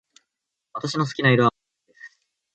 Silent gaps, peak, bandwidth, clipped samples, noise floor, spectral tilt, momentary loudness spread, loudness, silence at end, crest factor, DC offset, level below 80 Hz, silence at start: none; -4 dBFS; 8.8 kHz; under 0.1%; -83 dBFS; -6 dB/octave; 14 LU; -21 LUFS; 0.45 s; 20 dB; under 0.1%; -64 dBFS; 0.75 s